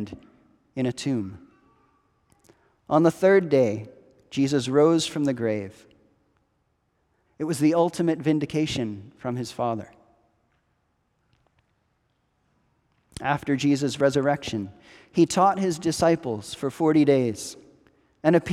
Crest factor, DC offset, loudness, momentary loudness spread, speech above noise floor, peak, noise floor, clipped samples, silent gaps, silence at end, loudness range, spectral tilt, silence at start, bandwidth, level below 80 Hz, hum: 20 dB; under 0.1%; -24 LUFS; 14 LU; 48 dB; -6 dBFS; -71 dBFS; under 0.1%; none; 0 s; 10 LU; -6 dB/octave; 0 s; 14 kHz; -60 dBFS; none